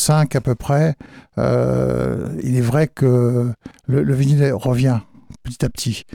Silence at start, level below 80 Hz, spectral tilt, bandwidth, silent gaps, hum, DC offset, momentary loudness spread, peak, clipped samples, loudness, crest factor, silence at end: 0 s; -42 dBFS; -6.5 dB/octave; 15.5 kHz; none; none; under 0.1%; 9 LU; -6 dBFS; under 0.1%; -18 LUFS; 12 dB; 0.15 s